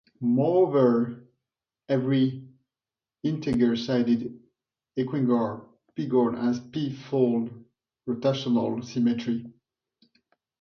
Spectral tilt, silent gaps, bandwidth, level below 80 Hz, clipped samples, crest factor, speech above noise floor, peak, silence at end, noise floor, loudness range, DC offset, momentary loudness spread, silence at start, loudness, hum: -8 dB/octave; none; 6.6 kHz; -64 dBFS; under 0.1%; 18 dB; over 65 dB; -10 dBFS; 1.1 s; under -90 dBFS; 2 LU; under 0.1%; 13 LU; 0.2 s; -26 LUFS; none